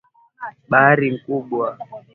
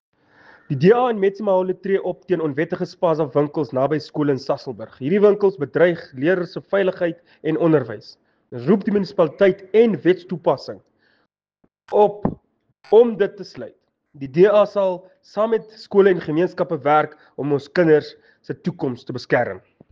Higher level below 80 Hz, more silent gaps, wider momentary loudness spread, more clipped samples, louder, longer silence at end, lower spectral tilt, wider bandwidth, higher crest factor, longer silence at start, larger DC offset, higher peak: about the same, -62 dBFS vs -60 dBFS; neither; first, 21 LU vs 13 LU; neither; about the same, -18 LUFS vs -19 LUFS; second, 0.15 s vs 0.35 s; first, -10 dB/octave vs -8 dB/octave; second, 4.3 kHz vs 7 kHz; about the same, 20 dB vs 16 dB; second, 0.4 s vs 0.7 s; neither; first, 0 dBFS vs -4 dBFS